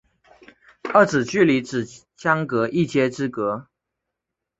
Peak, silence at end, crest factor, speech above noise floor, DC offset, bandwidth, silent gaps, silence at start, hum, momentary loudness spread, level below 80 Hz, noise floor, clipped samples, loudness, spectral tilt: -2 dBFS; 0.95 s; 20 dB; 63 dB; under 0.1%; 8.2 kHz; none; 0.85 s; none; 11 LU; -62 dBFS; -83 dBFS; under 0.1%; -21 LUFS; -6 dB/octave